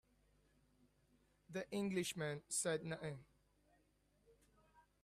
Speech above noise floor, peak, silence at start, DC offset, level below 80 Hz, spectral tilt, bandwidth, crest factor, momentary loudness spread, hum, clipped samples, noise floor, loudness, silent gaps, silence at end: 34 dB; -28 dBFS; 1.5 s; under 0.1%; -78 dBFS; -4 dB/octave; 14.5 kHz; 20 dB; 11 LU; 50 Hz at -65 dBFS; under 0.1%; -78 dBFS; -44 LUFS; none; 0.25 s